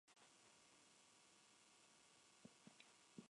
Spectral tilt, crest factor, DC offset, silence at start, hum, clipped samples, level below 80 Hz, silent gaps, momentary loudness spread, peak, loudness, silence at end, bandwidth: -2.5 dB/octave; 24 dB; under 0.1%; 0.05 s; none; under 0.1%; under -90 dBFS; none; 4 LU; -46 dBFS; -68 LUFS; 0 s; 11 kHz